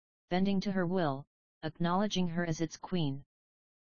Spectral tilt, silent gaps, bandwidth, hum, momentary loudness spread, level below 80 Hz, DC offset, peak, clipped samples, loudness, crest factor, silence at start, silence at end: -5.5 dB/octave; 1.27-1.61 s; 7 kHz; none; 12 LU; -60 dBFS; 0.6%; -18 dBFS; under 0.1%; -34 LUFS; 16 dB; 0.3 s; 0.6 s